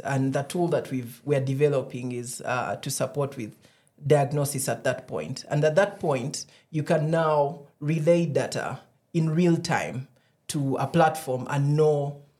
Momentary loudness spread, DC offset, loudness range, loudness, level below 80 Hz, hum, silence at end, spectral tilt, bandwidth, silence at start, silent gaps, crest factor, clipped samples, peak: 11 LU; under 0.1%; 3 LU; -26 LUFS; -68 dBFS; none; 0.2 s; -6 dB/octave; 15 kHz; 0.05 s; none; 18 dB; under 0.1%; -8 dBFS